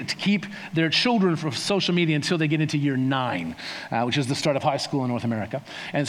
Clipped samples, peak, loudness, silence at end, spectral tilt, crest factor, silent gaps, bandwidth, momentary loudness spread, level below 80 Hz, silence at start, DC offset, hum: under 0.1%; -8 dBFS; -24 LUFS; 0 s; -5 dB/octave; 16 dB; none; 13.5 kHz; 9 LU; -64 dBFS; 0 s; under 0.1%; none